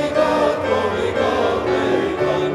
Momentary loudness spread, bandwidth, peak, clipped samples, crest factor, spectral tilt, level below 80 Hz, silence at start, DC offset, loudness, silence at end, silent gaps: 2 LU; 13.5 kHz; -4 dBFS; under 0.1%; 14 dB; -5.5 dB/octave; -44 dBFS; 0 s; under 0.1%; -19 LUFS; 0 s; none